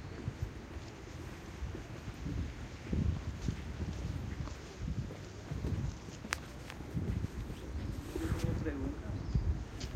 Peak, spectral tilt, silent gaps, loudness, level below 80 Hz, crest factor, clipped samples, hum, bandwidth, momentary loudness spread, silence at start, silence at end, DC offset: -10 dBFS; -6.5 dB/octave; none; -41 LUFS; -44 dBFS; 30 dB; under 0.1%; none; 16 kHz; 10 LU; 0 s; 0 s; under 0.1%